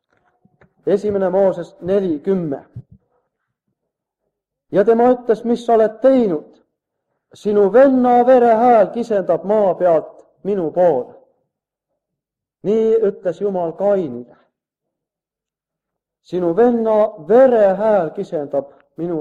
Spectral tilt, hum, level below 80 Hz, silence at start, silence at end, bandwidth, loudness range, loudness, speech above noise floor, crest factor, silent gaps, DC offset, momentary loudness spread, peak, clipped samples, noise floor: -8 dB/octave; none; -60 dBFS; 0.85 s; 0 s; 8.6 kHz; 8 LU; -16 LUFS; 72 dB; 16 dB; none; under 0.1%; 14 LU; -2 dBFS; under 0.1%; -87 dBFS